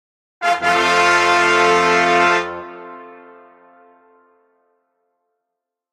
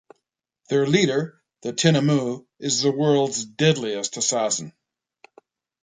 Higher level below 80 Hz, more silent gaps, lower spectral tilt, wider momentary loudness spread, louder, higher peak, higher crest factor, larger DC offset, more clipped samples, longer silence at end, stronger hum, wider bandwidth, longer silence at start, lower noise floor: first, -60 dBFS vs -66 dBFS; neither; second, -2.5 dB/octave vs -4.5 dB/octave; first, 20 LU vs 11 LU; first, -14 LUFS vs -22 LUFS; about the same, -2 dBFS vs -4 dBFS; about the same, 18 dB vs 20 dB; neither; neither; first, 2.8 s vs 1.1 s; neither; first, 14.5 kHz vs 9.6 kHz; second, 0.4 s vs 0.7 s; about the same, -81 dBFS vs -78 dBFS